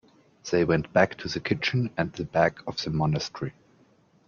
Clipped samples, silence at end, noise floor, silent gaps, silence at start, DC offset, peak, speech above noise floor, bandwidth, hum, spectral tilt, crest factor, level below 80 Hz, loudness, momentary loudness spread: under 0.1%; 0.75 s; -61 dBFS; none; 0.45 s; under 0.1%; -6 dBFS; 35 dB; 7.2 kHz; none; -6 dB/octave; 22 dB; -54 dBFS; -26 LUFS; 10 LU